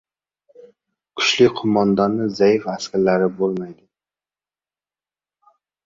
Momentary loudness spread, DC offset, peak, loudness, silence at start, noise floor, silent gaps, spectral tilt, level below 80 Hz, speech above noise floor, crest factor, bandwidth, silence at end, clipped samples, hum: 10 LU; under 0.1%; -2 dBFS; -18 LUFS; 1.15 s; under -90 dBFS; none; -5 dB/octave; -60 dBFS; over 72 dB; 20 dB; 7.6 kHz; 2.1 s; under 0.1%; none